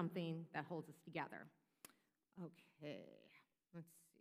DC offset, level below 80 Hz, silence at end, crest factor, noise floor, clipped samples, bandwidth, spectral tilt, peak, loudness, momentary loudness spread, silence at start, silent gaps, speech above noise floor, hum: under 0.1%; under -90 dBFS; 0.15 s; 24 dB; -78 dBFS; under 0.1%; 15.5 kHz; -6.5 dB/octave; -28 dBFS; -52 LUFS; 17 LU; 0 s; none; 27 dB; none